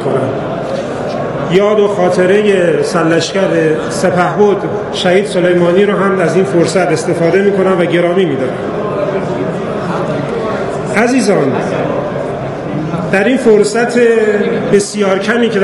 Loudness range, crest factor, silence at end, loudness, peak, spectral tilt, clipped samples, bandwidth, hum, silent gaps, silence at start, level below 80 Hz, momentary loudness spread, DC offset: 4 LU; 12 dB; 0 s; -12 LUFS; 0 dBFS; -5.5 dB/octave; 0.2%; 12 kHz; none; none; 0 s; -46 dBFS; 8 LU; under 0.1%